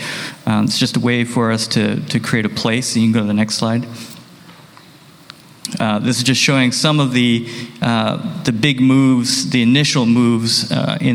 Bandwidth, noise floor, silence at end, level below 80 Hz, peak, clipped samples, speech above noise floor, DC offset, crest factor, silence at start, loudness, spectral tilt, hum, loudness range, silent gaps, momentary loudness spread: 16 kHz; -43 dBFS; 0 s; -54 dBFS; 0 dBFS; under 0.1%; 28 dB; under 0.1%; 16 dB; 0 s; -15 LUFS; -4.5 dB/octave; none; 5 LU; none; 8 LU